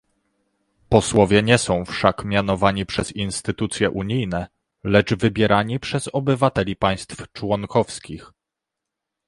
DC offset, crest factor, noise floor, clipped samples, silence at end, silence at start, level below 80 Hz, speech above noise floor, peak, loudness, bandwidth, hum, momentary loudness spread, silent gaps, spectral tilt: under 0.1%; 20 dB; -84 dBFS; under 0.1%; 1 s; 0.9 s; -44 dBFS; 64 dB; 0 dBFS; -20 LUFS; 11.5 kHz; none; 13 LU; none; -5 dB/octave